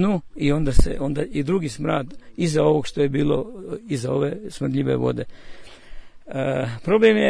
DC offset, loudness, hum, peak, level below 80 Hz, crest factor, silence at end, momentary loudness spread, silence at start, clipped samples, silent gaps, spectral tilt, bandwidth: under 0.1%; -23 LUFS; none; -4 dBFS; -30 dBFS; 18 dB; 0 s; 9 LU; 0 s; under 0.1%; none; -6.5 dB/octave; 10.5 kHz